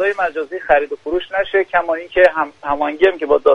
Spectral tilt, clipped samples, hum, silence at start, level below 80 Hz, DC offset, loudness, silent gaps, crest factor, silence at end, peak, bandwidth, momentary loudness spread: -5 dB/octave; under 0.1%; none; 0 s; -46 dBFS; under 0.1%; -17 LUFS; none; 16 dB; 0 s; 0 dBFS; 7 kHz; 8 LU